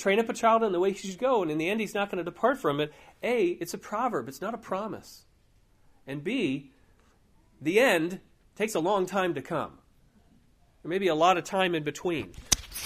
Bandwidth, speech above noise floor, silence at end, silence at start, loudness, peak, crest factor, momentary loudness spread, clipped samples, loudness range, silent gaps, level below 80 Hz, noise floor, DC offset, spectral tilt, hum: 15.5 kHz; 35 dB; 0 s; 0 s; -28 LUFS; -4 dBFS; 24 dB; 12 LU; under 0.1%; 6 LU; none; -56 dBFS; -63 dBFS; under 0.1%; -4 dB/octave; none